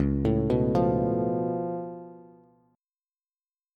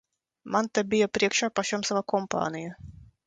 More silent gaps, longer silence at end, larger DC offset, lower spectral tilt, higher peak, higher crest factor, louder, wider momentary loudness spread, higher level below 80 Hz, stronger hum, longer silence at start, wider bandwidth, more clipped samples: neither; first, 1.55 s vs 0.2 s; neither; first, -10.5 dB/octave vs -3.5 dB/octave; second, -12 dBFS vs -8 dBFS; about the same, 16 dB vs 20 dB; about the same, -26 LUFS vs -27 LUFS; first, 16 LU vs 11 LU; first, -42 dBFS vs -60 dBFS; neither; second, 0 s vs 0.45 s; second, 6.6 kHz vs 9.4 kHz; neither